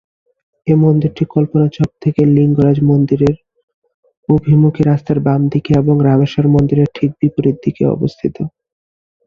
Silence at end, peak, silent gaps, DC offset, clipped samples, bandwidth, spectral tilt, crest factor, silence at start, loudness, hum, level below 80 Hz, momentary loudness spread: 0.8 s; -2 dBFS; 3.63-3.68 s, 3.74-3.82 s, 3.94-4.03 s, 4.17-4.23 s; under 0.1%; under 0.1%; 6.4 kHz; -10 dB/octave; 12 dB; 0.65 s; -13 LUFS; none; -42 dBFS; 7 LU